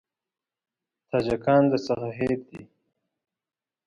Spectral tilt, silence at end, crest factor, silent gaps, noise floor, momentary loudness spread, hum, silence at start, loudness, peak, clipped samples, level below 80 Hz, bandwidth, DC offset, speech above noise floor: -7.5 dB/octave; 1.2 s; 20 dB; none; under -90 dBFS; 9 LU; none; 1.15 s; -25 LUFS; -8 dBFS; under 0.1%; -58 dBFS; 9.4 kHz; under 0.1%; over 66 dB